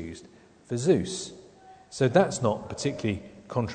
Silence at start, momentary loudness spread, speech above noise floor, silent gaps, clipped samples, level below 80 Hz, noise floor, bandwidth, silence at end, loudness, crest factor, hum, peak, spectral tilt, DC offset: 0 s; 18 LU; 27 dB; none; under 0.1%; -58 dBFS; -53 dBFS; 9.4 kHz; 0 s; -27 LUFS; 20 dB; none; -8 dBFS; -5.5 dB/octave; under 0.1%